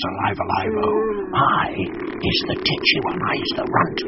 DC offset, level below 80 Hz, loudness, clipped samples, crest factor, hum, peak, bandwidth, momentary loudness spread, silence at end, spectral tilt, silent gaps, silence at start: under 0.1%; -44 dBFS; -20 LUFS; under 0.1%; 18 dB; none; -2 dBFS; 6 kHz; 6 LU; 0 s; -2.5 dB/octave; none; 0 s